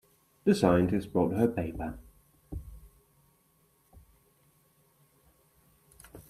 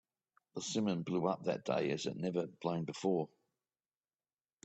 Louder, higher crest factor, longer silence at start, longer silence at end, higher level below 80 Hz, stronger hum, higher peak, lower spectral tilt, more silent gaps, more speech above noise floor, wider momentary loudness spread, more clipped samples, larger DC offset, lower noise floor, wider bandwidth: first, -28 LUFS vs -37 LUFS; about the same, 24 dB vs 20 dB; about the same, 0.45 s vs 0.55 s; second, 0.1 s vs 1.4 s; first, -52 dBFS vs -78 dBFS; neither; first, -10 dBFS vs -20 dBFS; first, -7.5 dB/octave vs -5.5 dB/octave; neither; second, 41 dB vs over 53 dB; first, 24 LU vs 4 LU; neither; neither; second, -68 dBFS vs under -90 dBFS; first, 15 kHz vs 8.4 kHz